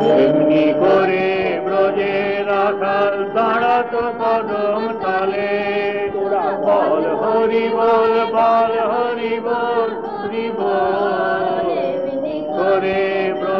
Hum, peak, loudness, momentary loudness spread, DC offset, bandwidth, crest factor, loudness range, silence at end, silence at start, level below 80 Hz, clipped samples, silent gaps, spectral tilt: none; -4 dBFS; -17 LUFS; 7 LU; 0.3%; 6 kHz; 12 dB; 3 LU; 0 s; 0 s; -56 dBFS; under 0.1%; none; -7.5 dB/octave